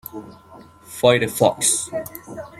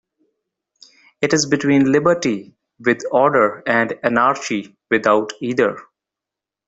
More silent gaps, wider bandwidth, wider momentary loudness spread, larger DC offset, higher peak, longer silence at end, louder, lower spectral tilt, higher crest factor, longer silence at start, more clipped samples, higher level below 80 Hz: neither; first, 16.5 kHz vs 8 kHz; first, 19 LU vs 8 LU; neither; about the same, -2 dBFS vs 0 dBFS; second, 0.1 s vs 0.85 s; about the same, -19 LUFS vs -18 LUFS; second, -3 dB/octave vs -4.5 dB/octave; about the same, 20 dB vs 18 dB; second, 0.15 s vs 1.2 s; neither; about the same, -58 dBFS vs -60 dBFS